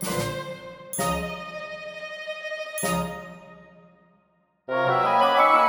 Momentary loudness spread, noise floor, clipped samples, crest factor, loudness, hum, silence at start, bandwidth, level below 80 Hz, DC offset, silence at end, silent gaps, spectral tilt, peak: 18 LU; -66 dBFS; under 0.1%; 18 dB; -26 LUFS; none; 0 s; over 20 kHz; -52 dBFS; under 0.1%; 0 s; none; -4 dB/octave; -8 dBFS